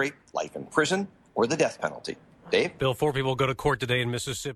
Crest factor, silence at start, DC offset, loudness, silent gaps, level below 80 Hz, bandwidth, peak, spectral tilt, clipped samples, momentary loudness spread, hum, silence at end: 18 dB; 0 s; under 0.1%; -27 LUFS; none; -54 dBFS; 14 kHz; -10 dBFS; -4.5 dB/octave; under 0.1%; 9 LU; none; 0 s